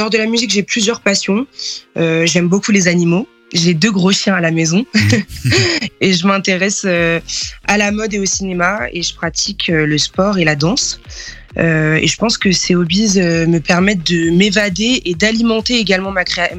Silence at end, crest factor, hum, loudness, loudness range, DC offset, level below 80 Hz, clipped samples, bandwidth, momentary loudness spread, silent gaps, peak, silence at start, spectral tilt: 0 s; 14 dB; none; -13 LUFS; 3 LU; under 0.1%; -40 dBFS; under 0.1%; 13 kHz; 6 LU; none; 0 dBFS; 0 s; -4 dB/octave